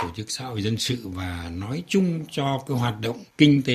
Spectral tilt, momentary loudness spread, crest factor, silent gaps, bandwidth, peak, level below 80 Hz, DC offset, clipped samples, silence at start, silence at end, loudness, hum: -5.5 dB/octave; 12 LU; 22 dB; none; 14.5 kHz; -2 dBFS; -54 dBFS; under 0.1%; under 0.1%; 0 s; 0 s; -25 LUFS; none